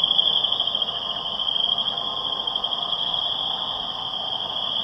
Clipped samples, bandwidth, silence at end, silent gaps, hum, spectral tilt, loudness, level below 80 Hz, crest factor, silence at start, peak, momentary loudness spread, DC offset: under 0.1%; 9.8 kHz; 0 s; none; none; -3 dB/octave; -22 LUFS; -58 dBFS; 20 dB; 0 s; -4 dBFS; 7 LU; under 0.1%